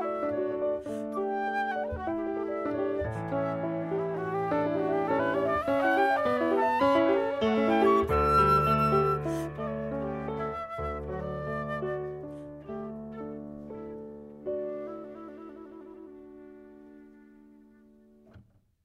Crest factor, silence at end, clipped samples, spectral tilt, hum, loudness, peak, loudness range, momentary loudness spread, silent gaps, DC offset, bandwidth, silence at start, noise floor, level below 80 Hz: 18 dB; 0.45 s; under 0.1%; -7.5 dB/octave; none; -29 LUFS; -12 dBFS; 16 LU; 19 LU; none; under 0.1%; 15.5 kHz; 0 s; -58 dBFS; -50 dBFS